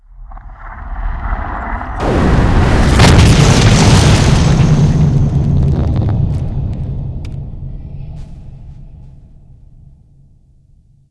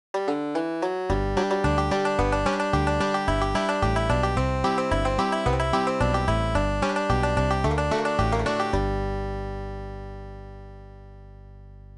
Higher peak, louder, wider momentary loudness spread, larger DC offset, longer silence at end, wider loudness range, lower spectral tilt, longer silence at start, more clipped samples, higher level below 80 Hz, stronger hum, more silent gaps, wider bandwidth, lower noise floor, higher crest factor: first, 0 dBFS vs -10 dBFS; first, -11 LUFS vs -24 LUFS; first, 21 LU vs 12 LU; neither; first, 2 s vs 0 s; first, 18 LU vs 5 LU; about the same, -6 dB/octave vs -6 dB/octave; about the same, 0.2 s vs 0.15 s; first, 0.3% vs under 0.1%; first, -18 dBFS vs -32 dBFS; second, none vs 50 Hz at -45 dBFS; neither; about the same, 11 kHz vs 11 kHz; about the same, -47 dBFS vs -44 dBFS; about the same, 12 dB vs 16 dB